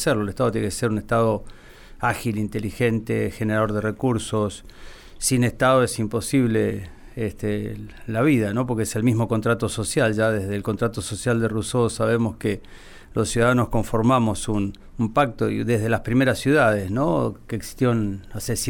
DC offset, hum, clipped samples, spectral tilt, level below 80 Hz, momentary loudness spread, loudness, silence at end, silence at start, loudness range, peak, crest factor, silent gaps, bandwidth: under 0.1%; none; under 0.1%; -5.5 dB/octave; -42 dBFS; 9 LU; -23 LUFS; 0 s; 0 s; 3 LU; -6 dBFS; 16 dB; none; 19 kHz